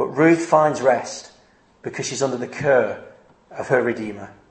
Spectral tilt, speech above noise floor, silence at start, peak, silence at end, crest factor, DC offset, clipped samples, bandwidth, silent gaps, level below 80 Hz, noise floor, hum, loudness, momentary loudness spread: -5 dB/octave; 35 dB; 0 s; -2 dBFS; 0.2 s; 18 dB; under 0.1%; under 0.1%; 8.8 kHz; none; -64 dBFS; -55 dBFS; none; -20 LUFS; 19 LU